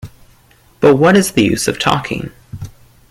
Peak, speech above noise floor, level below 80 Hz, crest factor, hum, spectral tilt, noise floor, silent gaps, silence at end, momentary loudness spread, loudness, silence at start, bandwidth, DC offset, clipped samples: 0 dBFS; 36 dB; -42 dBFS; 14 dB; none; -5 dB/octave; -49 dBFS; none; 0.4 s; 22 LU; -13 LUFS; 0.05 s; 16 kHz; under 0.1%; under 0.1%